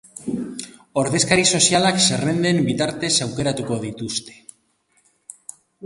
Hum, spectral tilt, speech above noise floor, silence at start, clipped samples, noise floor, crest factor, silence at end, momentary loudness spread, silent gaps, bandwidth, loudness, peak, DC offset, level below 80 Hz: none; -3 dB/octave; 44 dB; 0.15 s; under 0.1%; -64 dBFS; 22 dB; 0 s; 18 LU; none; 11.5 kHz; -19 LUFS; 0 dBFS; under 0.1%; -54 dBFS